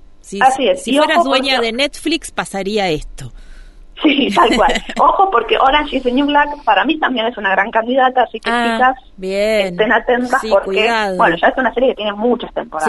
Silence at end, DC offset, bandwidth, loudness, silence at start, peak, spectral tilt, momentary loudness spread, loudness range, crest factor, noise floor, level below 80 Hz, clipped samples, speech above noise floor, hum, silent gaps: 0 s; under 0.1%; 12 kHz; -14 LUFS; 0.25 s; 0 dBFS; -4 dB/octave; 7 LU; 3 LU; 14 dB; -36 dBFS; -36 dBFS; under 0.1%; 21 dB; none; none